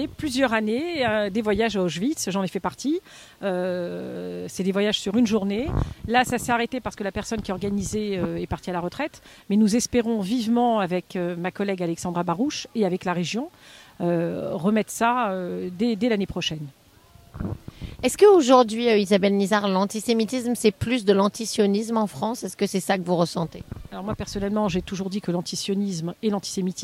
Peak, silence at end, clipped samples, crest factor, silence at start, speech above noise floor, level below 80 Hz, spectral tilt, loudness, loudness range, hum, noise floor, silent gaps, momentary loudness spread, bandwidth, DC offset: -4 dBFS; 0 s; under 0.1%; 20 dB; 0 s; 29 dB; -46 dBFS; -5 dB/octave; -24 LUFS; 7 LU; none; -53 dBFS; none; 10 LU; 16 kHz; under 0.1%